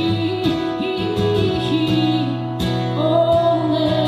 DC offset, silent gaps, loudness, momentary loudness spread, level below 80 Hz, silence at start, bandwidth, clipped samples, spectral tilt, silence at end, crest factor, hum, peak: under 0.1%; none; -19 LUFS; 6 LU; -42 dBFS; 0 s; 14 kHz; under 0.1%; -7.5 dB/octave; 0 s; 14 dB; none; -4 dBFS